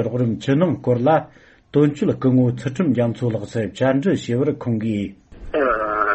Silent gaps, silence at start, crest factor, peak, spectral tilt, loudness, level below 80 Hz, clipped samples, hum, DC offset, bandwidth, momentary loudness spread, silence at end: none; 0 s; 14 dB; -4 dBFS; -8 dB/octave; -20 LUFS; -48 dBFS; under 0.1%; none; under 0.1%; 8.4 kHz; 7 LU; 0 s